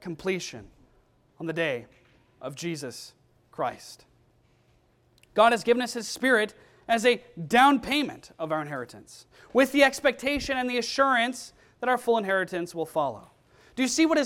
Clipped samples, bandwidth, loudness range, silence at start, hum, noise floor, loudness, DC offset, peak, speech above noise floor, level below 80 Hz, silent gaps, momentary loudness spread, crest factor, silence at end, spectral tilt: under 0.1%; 16.5 kHz; 11 LU; 0 s; none; -64 dBFS; -26 LUFS; under 0.1%; -6 dBFS; 38 dB; -58 dBFS; none; 21 LU; 22 dB; 0 s; -3.5 dB/octave